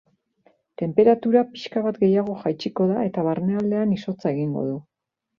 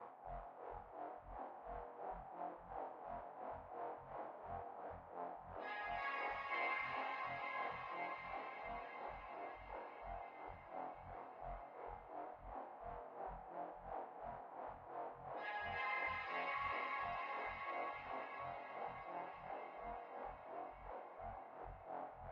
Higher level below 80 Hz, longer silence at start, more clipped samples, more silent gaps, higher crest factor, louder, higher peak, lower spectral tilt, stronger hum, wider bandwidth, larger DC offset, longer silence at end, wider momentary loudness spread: about the same, -64 dBFS vs -66 dBFS; first, 0.8 s vs 0 s; neither; neither; about the same, 18 dB vs 18 dB; first, -22 LUFS vs -48 LUFS; first, -4 dBFS vs -30 dBFS; first, -8.5 dB/octave vs -2 dB/octave; neither; about the same, 7 kHz vs 6.8 kHz; neither; first, 0.6 s vs 0 s; about the same, 9 LU vs 10 LU